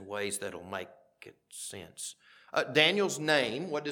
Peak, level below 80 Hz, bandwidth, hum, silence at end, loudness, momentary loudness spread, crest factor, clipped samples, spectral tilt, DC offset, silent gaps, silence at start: -8 dBFS; -78 dBFS; 19 kHz; none; 0 s; -30 LUFS; 17 LU; 24 dB; under 0.1%; -3 dB/octave; under 0.1%; none; 0 s